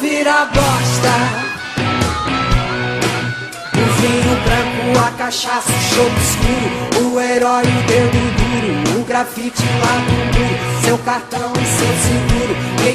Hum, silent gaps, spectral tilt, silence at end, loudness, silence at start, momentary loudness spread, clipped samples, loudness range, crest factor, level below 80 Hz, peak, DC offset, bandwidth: none; none; -4.5 dB/octave; 0 s; -15 LUFS; 0 s; 5 LU; under 0.1%; 2 LU; 14 dB; -28 dBFS; 0 dBFS; under 0.1%; 15.5 kHz